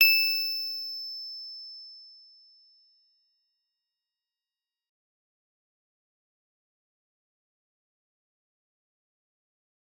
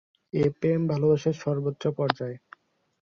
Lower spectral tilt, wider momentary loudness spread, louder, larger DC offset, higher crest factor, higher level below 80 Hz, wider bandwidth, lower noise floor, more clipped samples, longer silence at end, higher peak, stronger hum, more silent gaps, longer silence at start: second, 5.5 dB/octave vs -7.5 dB/octave; first, 24 LU vs 9 LU; about the same, -27 LUFS vs -27 LUFS; neither; about the same, 28 dB vs 24 dB; second, under -90 dBFS vs -62 dBFS; first, over 20 kHz vs 7.2 kHz; first, under -90 dBFS vs -55 dBFS; neither; first, 7.85 s vs 0.7 s; about the same, -6 dBFS vs -4 dBFS; neither; neither; second, 0 s vs 0.35 s